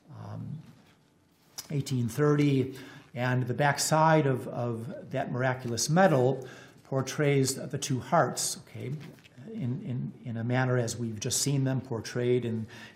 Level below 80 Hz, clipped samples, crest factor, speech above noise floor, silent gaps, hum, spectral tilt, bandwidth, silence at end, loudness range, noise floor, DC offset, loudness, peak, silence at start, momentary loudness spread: -70 dBFS; under 0.1%; 20 dB; 36 dB; none; none; -5 dB/octave; 16 kHz; 0.05 s; 5 LU; -64 dBFS; under 0.1%; -29 LUFS; -10 dBFS; 0.1 s; 18 LU